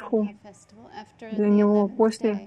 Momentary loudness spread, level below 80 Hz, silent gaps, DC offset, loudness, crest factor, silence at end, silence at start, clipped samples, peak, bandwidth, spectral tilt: 23 LU; -68 dBFS; none; under 0.1%; -23 LUFS; 16 dB; 0 s; 0 s; under 0.1%; -8 dBFS; 10 kHz; -7.5 dB/octave